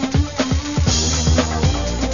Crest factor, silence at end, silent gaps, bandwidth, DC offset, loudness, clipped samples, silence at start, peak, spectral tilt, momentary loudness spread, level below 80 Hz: 14 dB; 0 s; none; 7.4 kHz; 0.6%; -18 LUFS; under 0.1%; 0 s; -4 dBFS; -4.5 dB/octave; 4 LU; -24 dBFS